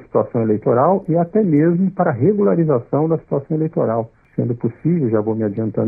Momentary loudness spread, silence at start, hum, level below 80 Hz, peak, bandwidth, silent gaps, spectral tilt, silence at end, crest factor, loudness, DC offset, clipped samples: 7 LU; 0 s; none; -56 dBFS; -4 dBFS; 2.6 kHz; none; -14 dB/octave; 0 s; 14 dB; -18 LUFS; under 0.1%; under 0.1%